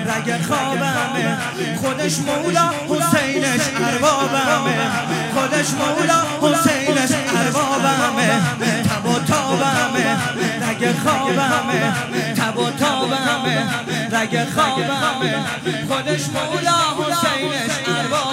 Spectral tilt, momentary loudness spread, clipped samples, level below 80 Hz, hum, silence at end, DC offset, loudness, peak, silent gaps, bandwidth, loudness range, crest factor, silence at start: -4 dB/octave; 4 LU; under 0.1%; -60 dBFS; none; 0 s; under 0.1%; -18 LUFS; -2 dBFS; none; 16 kHz; 2 LU; 16 dB; 0 s